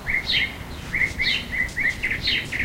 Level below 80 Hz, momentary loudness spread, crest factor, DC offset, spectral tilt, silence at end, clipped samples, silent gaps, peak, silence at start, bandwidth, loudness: -38 dBFS; 6 LU; 16 dB; under 0.1%; -2.5 dB/octave; 0 s; under 0.1%; none; -8 dBFS; 0 s; 16 kHz; -22 LUFS